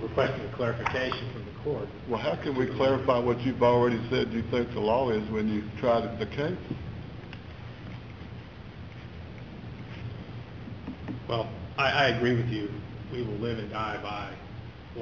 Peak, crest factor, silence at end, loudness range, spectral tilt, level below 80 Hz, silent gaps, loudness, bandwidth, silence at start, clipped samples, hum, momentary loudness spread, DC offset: -10 dBFS; 20 dB; 0 s; 15 LU; -7 dB/octave; -48 dBFS; none; -29 LUFS; 7 kHz; 0 s; under 0.1%; none; 18 LU; 0.1%